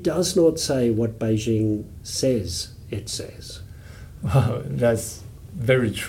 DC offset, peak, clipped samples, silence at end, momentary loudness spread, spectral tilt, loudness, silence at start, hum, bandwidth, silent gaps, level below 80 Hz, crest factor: under 0.1%; -6 dBFS; under 0.1%; 0 s; 19 LU; -5.5 dB/octave; -23 LUFS; 0 s; none; 17 kHz; none; -44 dBFS; 18 dB